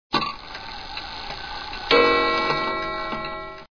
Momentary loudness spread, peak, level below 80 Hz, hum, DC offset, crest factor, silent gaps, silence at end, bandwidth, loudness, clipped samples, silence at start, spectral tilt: 16 LU; -2 dBFS; -44 dBFS; none; 0.3%; 24 dB; none; 0.05 s; 5.4 kHz; -23 LUFS; under 0.1%; 0.1 s; -4.5 dB/octave